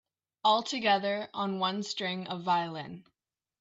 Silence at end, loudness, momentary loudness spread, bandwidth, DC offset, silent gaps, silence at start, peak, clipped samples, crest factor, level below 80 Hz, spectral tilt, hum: 0.6 s; -30 LUFS; 12 LU; 8 kHz; under 0.1%; none; 0.45 s; -14 dBFS; under 0.1%; 18 dB; -80 dBFS; -4 dB/octave; none